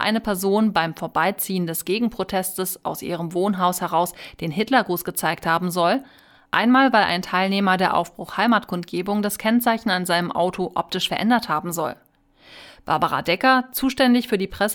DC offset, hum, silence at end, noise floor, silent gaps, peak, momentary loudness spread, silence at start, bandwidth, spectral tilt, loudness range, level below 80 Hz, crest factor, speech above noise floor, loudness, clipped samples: under 0.1%; none; 0 s; -52 dBFS; none; -4 dBFS; 9 LU; 0 s; over 20 kHz; -4.5 dB/octave; 4 LU; -54 dBFS; 18 dB; 31 dB; -21 LUFS; under 0.1%